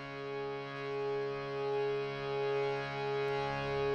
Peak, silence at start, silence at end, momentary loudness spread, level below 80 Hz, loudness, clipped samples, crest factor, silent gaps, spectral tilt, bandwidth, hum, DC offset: -22 dBFS; 0 s; 0 s; 6 LU; -62 dBFS; -36 LUFS; under 0.1%; 14 dB; none; -6 dB/octave; 7.4 kHz; none; under 0.1%